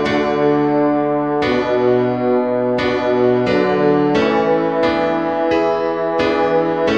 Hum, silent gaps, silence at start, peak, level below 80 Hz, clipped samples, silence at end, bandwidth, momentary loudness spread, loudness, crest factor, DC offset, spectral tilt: none; none; 0 s; -2 dBFS; -46 dBFS; under 0.1%; 0 s; 8 kHz; 3 LU; -16 LUFS; 12 dB; 0.3%; -7 dB/octave